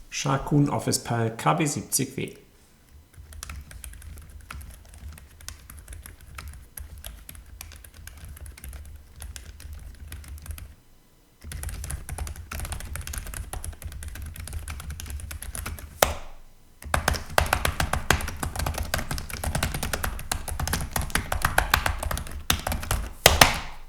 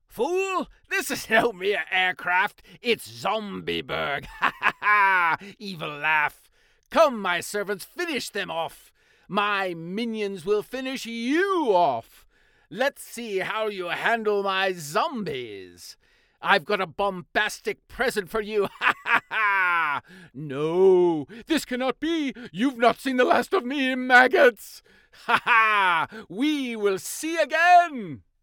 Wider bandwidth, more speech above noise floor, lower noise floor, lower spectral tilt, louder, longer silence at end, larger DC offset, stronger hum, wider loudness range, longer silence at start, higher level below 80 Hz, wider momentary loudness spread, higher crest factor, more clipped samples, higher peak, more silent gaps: about the same, over 20 kHz vs 18.5 kHz; second, 31 dB vs 36 dB; second, -56 dBFS vs -60 dBFS; about the same, -3.5 dB/octave vs -3.5 dB/octave; second, -27 LUFS vs -24 LUFS; second, 0 s vs 0.25 s; neither; neither; first, 16 LU vs 6 LU; second, 0 s vs 0.15 s; first, -36 dBFS vs -60 dBFS; first, 20 LU vs 13 LU; first, 30 dB vs 22 dB; neither; about the same, 0 dBFS vs -2 dBFS; neither